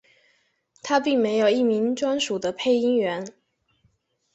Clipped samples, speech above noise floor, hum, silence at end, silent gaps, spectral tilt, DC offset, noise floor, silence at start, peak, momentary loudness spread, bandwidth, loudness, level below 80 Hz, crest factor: under 0.1%; 45 dB; none; 1.05 s; none; -4 dB/octave; under 0.1%; -67 dBFS; 0.85 s; -6 dBFS; 9 LU; 8.2 kHz; -23 LUFS; -70 dBFS; 18 dB